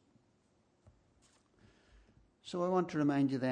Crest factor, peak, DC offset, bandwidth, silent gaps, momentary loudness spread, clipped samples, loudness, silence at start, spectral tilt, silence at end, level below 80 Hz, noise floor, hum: 16 dB; -22 dBFS; under 0.1%; 9.6 kHz; none; 12 LU; under 0.1%; -34 LUFS; 2.45 s; -7.5 dB/octave; 0 s; -72 dBFS; -73 dBFS; none